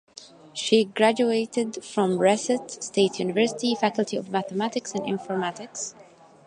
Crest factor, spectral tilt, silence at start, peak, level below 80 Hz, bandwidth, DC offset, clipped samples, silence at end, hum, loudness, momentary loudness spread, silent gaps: 20 dB; -4 dB/octave; 0.2 s; -6 dBFS; -74 dBFS; 11 kHz; under 0.1%; under 0.1%; 0.45 s; none; -25 LUFS; 12 LU; none